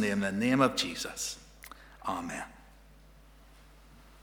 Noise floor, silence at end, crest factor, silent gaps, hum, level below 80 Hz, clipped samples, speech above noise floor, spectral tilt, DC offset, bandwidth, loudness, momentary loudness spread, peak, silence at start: -56 dBFS; 0.05 s; 26 dB; none; none; -58 dBFS; under 0.1%; 25 dB; -4 dB/octave; under 0.1%; over 20 kHz; -31 LUFS; 22 LU; -8 dBFS; 0 s